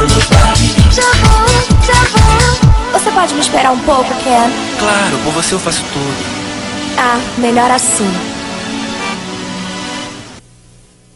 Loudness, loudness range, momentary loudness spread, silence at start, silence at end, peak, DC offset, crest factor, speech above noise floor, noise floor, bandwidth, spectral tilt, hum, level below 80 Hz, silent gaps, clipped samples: -11 LUFS; 6 LU; 12 LU; 0 s; 0.75 s; 0 dBFS; under 0.1%; 12 dB; 31 dB; -43 dBFS; 13 kHz; -4 dB/octave; none; -18 dBFS; none; 0.7%